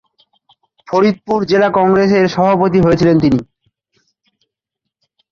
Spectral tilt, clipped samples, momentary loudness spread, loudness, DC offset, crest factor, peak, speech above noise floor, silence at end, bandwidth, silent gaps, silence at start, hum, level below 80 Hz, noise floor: -7.5 dB/octave; under 0.1%; 5 LU; -13 LUFS; under 0.1%; 14 dB; -2 dBFS; 68 dB; 1.9 s; 7.2 kHz; none; 0.9 s; none; -44 dBFS; -79 dBFS